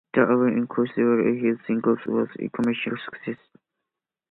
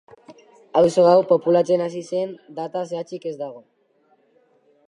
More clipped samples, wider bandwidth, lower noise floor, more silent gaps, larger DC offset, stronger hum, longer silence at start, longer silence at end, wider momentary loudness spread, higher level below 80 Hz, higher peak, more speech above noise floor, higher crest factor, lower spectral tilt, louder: neither; second, 4.1 kHz vs 10.5 kHz; first, -85 dBFS vs -62 dBFS; neither; neither; neither; second, 0.15 s vs 0.3 s; second, 0.95 s vs 1.3 s; second, 13 LU vs 16 LU; about the same, -68 dBFS vs -68 dBFS; about the same, -4 dBFS vs -4 dBFS; first, 62 dB vs 42 dB; about the same, 20 dB vs 18 dB; first, -8.5 dB/octave vs -6.5 dB/octave; second, -24 LUFS vs -20 LUFS